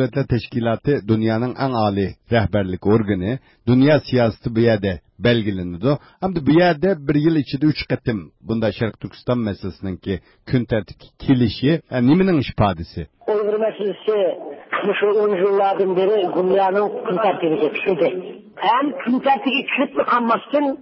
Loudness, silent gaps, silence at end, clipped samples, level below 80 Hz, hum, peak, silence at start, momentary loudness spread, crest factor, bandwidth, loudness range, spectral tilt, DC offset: -19 LUFS; none; 0 s; under 0.1%; -42 dBFS; none; -4 dBFS; 0 s; 9 LU; 14 dB; 5.8 kHz; 4 LU; -11.5 dB/octave; under 0.1%